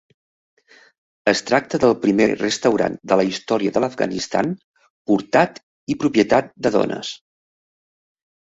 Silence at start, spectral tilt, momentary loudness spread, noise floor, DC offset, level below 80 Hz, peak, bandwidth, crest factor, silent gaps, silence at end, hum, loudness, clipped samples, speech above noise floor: 1.25 s; -5 dB/octave; 11 LU; under -90 dBFS; under 0.1%; -56 dBFS; -2 dBFS; 8 kHz; 18 dB; 4.64-4.74 s, 4.90-5.05 s, 5.63-5.87 s; 1.3 s; none; -19 LUFS; under 0.1%; over 71 dB